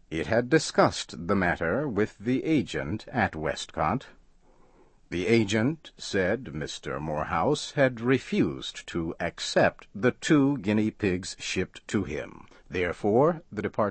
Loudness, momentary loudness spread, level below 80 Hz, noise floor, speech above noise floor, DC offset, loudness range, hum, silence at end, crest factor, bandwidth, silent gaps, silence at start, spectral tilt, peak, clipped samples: -27 LUFS; 10 LU; -52 dBFS; -57 dBFS; 31 dB; under 0.1%; 3 LU; none; 0 s; 20 dB; 8.8 kHz; none; 0.1 s; -5.5 dB/octave; -6 dBFS; under 0.1%